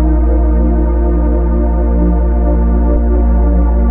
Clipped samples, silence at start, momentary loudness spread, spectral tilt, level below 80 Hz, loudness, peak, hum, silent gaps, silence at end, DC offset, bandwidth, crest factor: under 0.1%; 0 s; 1 LU; -12.5 dB/octave; -10 dBFS; -13 LUFS; -2 dBFS; none; none; 0 s; under 0.1%; 2.2 kHz; 8 dB